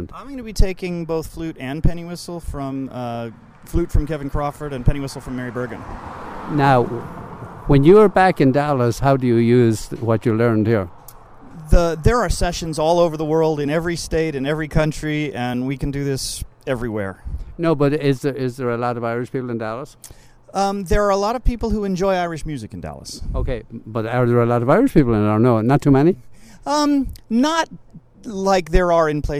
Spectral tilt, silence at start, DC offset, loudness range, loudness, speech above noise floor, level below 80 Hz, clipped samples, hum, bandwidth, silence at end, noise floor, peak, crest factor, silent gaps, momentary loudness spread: -6.5 dB/octave; 0 s; under 0.1%; 10 LU; -19 LUFS; 23 dB; -28 dBFS; under 0.1%; none; 16 kHz; 0 s; -41 dBFS; -2 dBFS; 18 dB; none; 15 LU